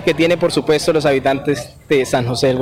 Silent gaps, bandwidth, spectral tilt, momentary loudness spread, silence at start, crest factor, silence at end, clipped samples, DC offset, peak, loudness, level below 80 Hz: none; 16.5 kHz; -5 dB/octave; 5 LU; 0 s; 12 dB; 0 s; under 0.1%; under 0.1%; -4 dBFS; -16 LUFS; -44 dBFS